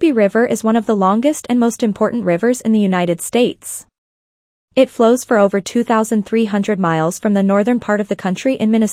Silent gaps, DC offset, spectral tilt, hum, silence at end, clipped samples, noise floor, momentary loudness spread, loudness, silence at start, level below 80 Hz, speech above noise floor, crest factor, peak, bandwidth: 3.98-4.68 s; under 0.1%; -5.5 dB/octave; none; 0 s; under 0.1%; under -90 dBFS; 5 LU; -15 LUFS; 0 s; -60 dBFS; over 75 dB; 14 dB; 0 dBFS; 15.5 kHz